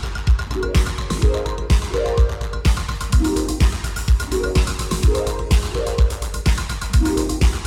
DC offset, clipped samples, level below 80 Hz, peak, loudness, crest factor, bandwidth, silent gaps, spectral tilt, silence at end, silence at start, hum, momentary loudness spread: under 0.1%; under 0.1%; -20 dBFS; -4 dBFS; -20 LUFS; 14 dB; 15.5 kHz; none; -5.5 dB/octave; 0 s; 0 s; none; 4 LU